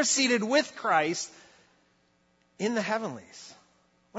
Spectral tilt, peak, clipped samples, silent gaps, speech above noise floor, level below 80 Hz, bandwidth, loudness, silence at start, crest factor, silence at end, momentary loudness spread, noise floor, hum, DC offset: -2.5 dB/octave; -10 dBFS; under 0.1%; none; 40 dB; -80 dBFS; 8.2 kHz; -27 LUFS; 0 s; 20 dB; 0 s; 22 LU; -68 dBFS; none; under 0.1%